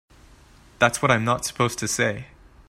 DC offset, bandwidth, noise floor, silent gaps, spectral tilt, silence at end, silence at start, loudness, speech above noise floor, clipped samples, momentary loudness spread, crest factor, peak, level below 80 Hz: under 0.1%; 16 kHz; -51 dBFS; none; -4 dB/octave; 0.45 s; 0.8 s; -22 LUFS; 29 dB; under 0.1%; 5 LU; 22 dB; -2 dBFS; -52 dBFS